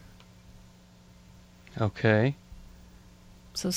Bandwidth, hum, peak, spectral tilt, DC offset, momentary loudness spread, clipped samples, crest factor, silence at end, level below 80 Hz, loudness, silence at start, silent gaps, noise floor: 14 kHz; 60 Hz at -50 dBFS; -10 dBFS; -5.5 dB/octave; under 0.1%; 26 LU; under 0.1%; 22 dB; 0 s; -56 dBFS; -28 LUFS; 0.55 s; none; -55 dBFS